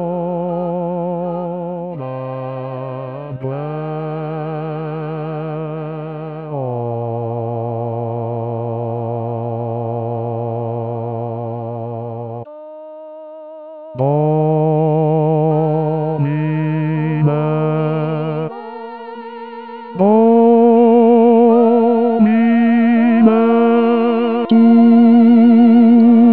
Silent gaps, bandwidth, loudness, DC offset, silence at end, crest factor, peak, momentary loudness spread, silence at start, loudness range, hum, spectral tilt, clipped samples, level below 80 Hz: none; 4.4 kHz; -15 LUFS; 0.2%; 0 s; 14 dB; 0 dBFS; 20 LU; 0 s; 13 LU; none; -12.5 dB/octave; under 0.1%; -66 dBFS